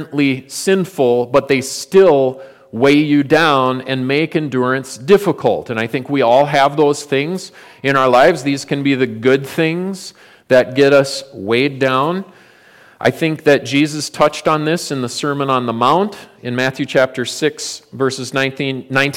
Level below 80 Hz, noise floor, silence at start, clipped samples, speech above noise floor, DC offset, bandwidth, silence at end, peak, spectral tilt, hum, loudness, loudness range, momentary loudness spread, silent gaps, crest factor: -56 dBFS; -46 dBFS; 0 s; under 0.1%; 31 dB; under 0.1%; 16.5 kHz; 0 s; -2 dBFS; -5 dB/octave; none; -15 LUFS; 3 LU; 10 LU; none; 14 dB